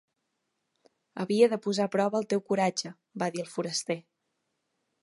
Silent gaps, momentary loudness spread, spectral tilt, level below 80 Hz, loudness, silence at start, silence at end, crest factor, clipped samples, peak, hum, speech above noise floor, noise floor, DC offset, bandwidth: none; 12 LU; -4.5 dB/octave; -80 dBFS; -29 LUFS; 1.15 s; 1.05 s; 22 dB; under 0.1%; -10 dBFS; none; 52 dB; -81 dBFS; under 0.1%; 11.5 kHz